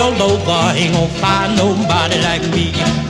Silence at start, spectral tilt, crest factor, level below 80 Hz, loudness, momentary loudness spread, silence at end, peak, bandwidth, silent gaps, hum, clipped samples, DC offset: 0 s; -4.5 dB/octave; 14 dB; -34 dBFS; -14 LUFS; 2 LU; 0 s; 0 dBFS; 12 kHz; none; none; under 0.1%; under 0.1%